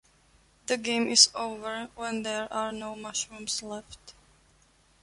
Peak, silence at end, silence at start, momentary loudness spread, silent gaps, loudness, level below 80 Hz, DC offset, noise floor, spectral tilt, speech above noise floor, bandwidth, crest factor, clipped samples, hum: -4 dBFS; 0.9 s; 0.7 s; 20 LU; none; -27 LUFS; -64 dBFS; under 0.1%; -63 dBFS; -0.5 dB/octave; 34 dB; 11.5 kHz; 28 dB; under 0.1%; none